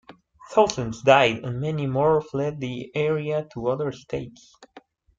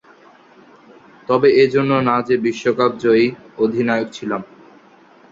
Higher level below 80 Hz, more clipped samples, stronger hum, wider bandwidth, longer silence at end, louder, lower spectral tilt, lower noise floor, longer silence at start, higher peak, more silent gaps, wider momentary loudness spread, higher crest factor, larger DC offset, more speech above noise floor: about the same, -56 dBFS vs -60 dBFS; neither; neither; about the same, 7.8 kHz vs 7.6 kHz; second, 0.4 s vs 0.9 s; second, -23 LUFS vs -17 LUFS; about the same, -5.5 dB/octave vs -6.5 dB/octave; about the same, -47 dBFS vs -48 dBFS; second, 0.1 s vs 1.3 s; about the same, -2 dBFS vs -2 dBFS; neither; first, 14 LU vs 11 LU; first, 22 dB vs 16 dB; neither; second, 24 dB vs 32 dB